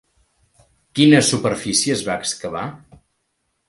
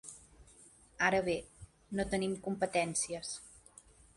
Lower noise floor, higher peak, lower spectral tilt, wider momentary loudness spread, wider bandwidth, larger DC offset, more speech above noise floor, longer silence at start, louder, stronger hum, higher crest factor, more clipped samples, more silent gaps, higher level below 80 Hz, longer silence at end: first, -71 dBFS vs -61 dBFS; first, -2 dBFS vs -16 dBFS; about the same, -4 dB/octave vs -3.5 dB/octave; second, 16 LU vs 23 LU; about the same, 11.5 kHz vs 11.5 kHz; neither; first, 54 dB vs 27 dB; first, 0.95 s vs 0.05 s; first, -18 LUFS vs -35 LUFS; neither; about the same, 20 dB vs 22 dB; neither; neither; about the same, -56 dBFS vs -60 dBFS; first, 0.9 s vs 0.6 s